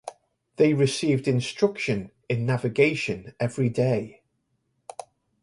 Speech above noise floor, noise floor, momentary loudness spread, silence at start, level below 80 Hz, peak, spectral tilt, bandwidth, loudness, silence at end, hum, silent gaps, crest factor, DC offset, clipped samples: 50 dB; -74 dBFS; 20 LU; 0.05 s; -60 dBFS; -6 dBFS; -6 dB/octave; 11.5 kHz; -25 LUFS; 1.35 s; none; none; 20 dB; under 0.1%; under 0.1%